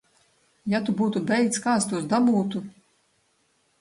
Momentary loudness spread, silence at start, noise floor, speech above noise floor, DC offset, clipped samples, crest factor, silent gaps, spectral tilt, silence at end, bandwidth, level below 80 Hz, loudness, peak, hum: 12 LU; 0.65 s; -68 dBFS; 44 dB; under 0.1%; under 0.1%; 16 dB; none; -5 dB/octave; 1.1 s; 11.5 kHz; -66 dBFS; -24 LUFS; -10 dBFS; none